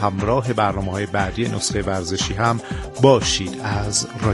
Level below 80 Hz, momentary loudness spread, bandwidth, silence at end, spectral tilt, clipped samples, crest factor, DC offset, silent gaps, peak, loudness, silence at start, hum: -38 dBFS; 9 LU; 11.5 kHz; 0 s; -4.5 dB/octave; under 0.1%; 20 dB; under 0.1%; none; 0 dBFS; -20 LUFS; 0 s; none